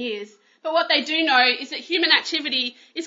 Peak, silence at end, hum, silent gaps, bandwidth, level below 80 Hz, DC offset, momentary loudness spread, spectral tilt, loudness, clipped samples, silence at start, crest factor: -2 dBFS; 0 s; none; none; 7.8 kHz; -82 dBFS; under 0.1%; 12 LU; -1 dB/octave; -20 LUFS; under 0.1%; 0 s; 20 dB